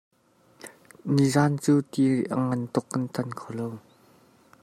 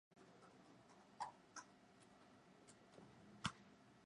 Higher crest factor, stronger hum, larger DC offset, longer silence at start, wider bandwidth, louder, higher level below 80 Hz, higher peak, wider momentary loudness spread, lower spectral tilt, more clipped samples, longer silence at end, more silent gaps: second, 18 dB vs 34 dB; neither; neither; first, 0.65 s vs 0.1 s; first, 14.5 kHz vs 10.5 kHz; first, -26 LUFS vs -58 LUFS; first, -68 dBFS vs -80 dBFS; first, -8 dBFS vs -26 dBFS; first, 23 LU vs 18 LU; first, -6.5 dB/octave vs -3.5 dB/octave; neither; first, 0.85 s vs 0 s; neither